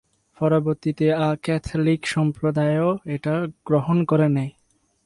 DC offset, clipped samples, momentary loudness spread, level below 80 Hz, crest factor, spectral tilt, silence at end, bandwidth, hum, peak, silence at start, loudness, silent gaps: under 0.1%; under 0.1%; 6 LU; -50 dBFS; 14 dB; -7.5 dB/octave; 0.55 s; 11.5 kHz; none; -8 dBFS; 0.4 s; -22 LUFS; none